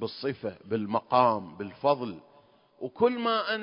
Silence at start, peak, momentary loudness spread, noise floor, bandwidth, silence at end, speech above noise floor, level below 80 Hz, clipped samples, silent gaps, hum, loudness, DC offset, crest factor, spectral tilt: 0 s; -8 dBFS; 16 LU; -60 dBFS; 5.4 kHz; 0 s; 32 dB; -68 dBFS; under 0.1%; none; none; -28 LUFS; under 0.1%; 20 dB; -9.5 dB/octave